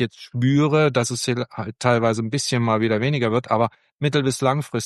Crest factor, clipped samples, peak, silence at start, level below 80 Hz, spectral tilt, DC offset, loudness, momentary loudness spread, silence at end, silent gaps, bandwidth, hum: 18 dB; under 0.1%; -4 dBFS; 0 s; -60 dBFS; -5.5 dB/octave; under 0.1%; -21 LUFS; 7 LU; 0 s; 3.92-3.99 s; 12.5 kHz; none